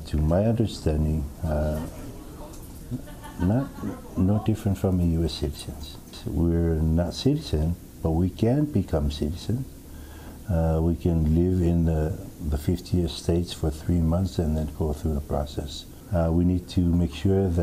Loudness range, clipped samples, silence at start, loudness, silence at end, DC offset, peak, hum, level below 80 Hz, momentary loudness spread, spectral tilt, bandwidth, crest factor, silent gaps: 4 LU; under 0.1%; 0 s; -26 LUFS; 0 s; under 0.1%; -10 dBFS; none; -34 dBFS; 15 LU; -7.5 dB/octave; 15.5 kHz; 16 dB; none